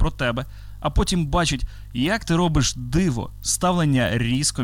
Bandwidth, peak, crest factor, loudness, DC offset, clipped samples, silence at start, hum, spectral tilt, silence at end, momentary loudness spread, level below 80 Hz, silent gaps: 17 kHz; -10 dBFS; 12 dB; -22 LUFS; under 0.1%; under 0.1%; 0 s; none; -4.5 dB/octave; 0 s; 9 LU; -30 dBFS; none